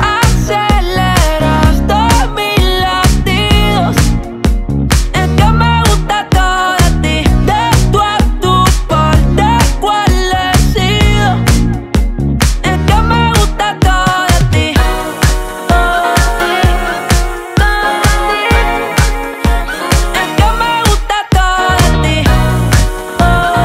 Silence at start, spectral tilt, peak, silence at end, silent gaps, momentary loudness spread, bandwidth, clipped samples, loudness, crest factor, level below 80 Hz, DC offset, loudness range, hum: 0 s; -5 dB/octave; 0 dBFS; 0 s; none; 4 LU; 16.5 kHz; under 0.1%; -11 LUFS; 10 dB; -14 dBFS; under 0.1%; 2 LU; none